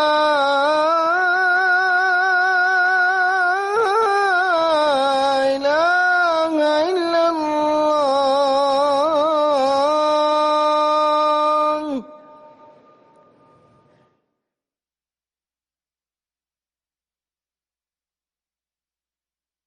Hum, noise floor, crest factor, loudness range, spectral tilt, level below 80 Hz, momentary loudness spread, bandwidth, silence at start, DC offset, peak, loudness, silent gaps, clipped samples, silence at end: none; under -90 dBFS; 10 dB; 5 LU; -2.5 dB/octave; -64 dBFS; 3 LU; 11.5 kHz; 0 s; under 0.1%; -8 dBFS; -17 LUFS; none; under 0.1%; 7.5 s